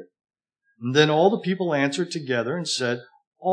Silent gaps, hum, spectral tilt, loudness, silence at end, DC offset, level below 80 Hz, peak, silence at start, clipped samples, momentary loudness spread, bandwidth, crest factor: 3.27-3.32 s; none; -4.5 dB/octave; -23 LUFS; 0 s; under 0.1%; -84 dBFS; -4 dBFS; 0 s; under 0.1%; 11 LU; 10.5 kHz; 20 dB